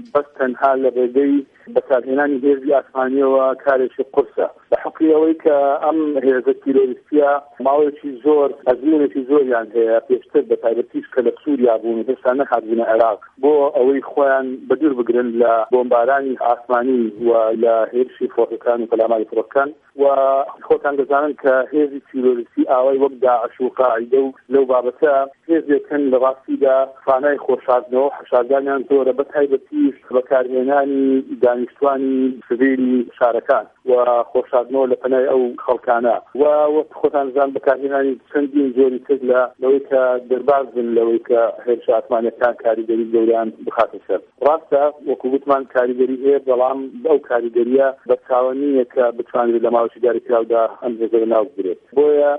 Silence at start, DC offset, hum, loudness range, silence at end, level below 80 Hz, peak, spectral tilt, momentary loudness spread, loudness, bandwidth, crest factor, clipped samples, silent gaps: 0 s; under 0.1%; none; 1 LU; 0 s; -66 dBFS; -2 dBFS; -8.5 dB/octave; 5 LU; -17 LUFS; 3.8 kHz; 14 dB; under 0.1%; none